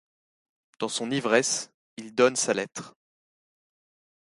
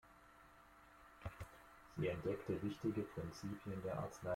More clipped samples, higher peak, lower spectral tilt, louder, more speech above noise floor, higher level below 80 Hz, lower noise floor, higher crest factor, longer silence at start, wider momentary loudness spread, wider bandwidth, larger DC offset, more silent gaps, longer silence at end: neither; first, -6 dBFS vs -28 dBFS; second, -2.5 dB/octave vs -7 dB/octave; first, -26 LUFS vs -46 LUFS; first, over 64 dB vs 21 dB; second, -74 dBFS vs -66 dBFS; first, under -90 dBFS vs -65 dBFS; first, 24 dB vs 18 dB; first, 0.8 s vs 0.05 s; second, 17 LU vs 22 LU; second, 11.5 kHz vs 16.5 kHz; neither; first, 1.74-1.97 s vs none; first, 1.3 s vs 0 s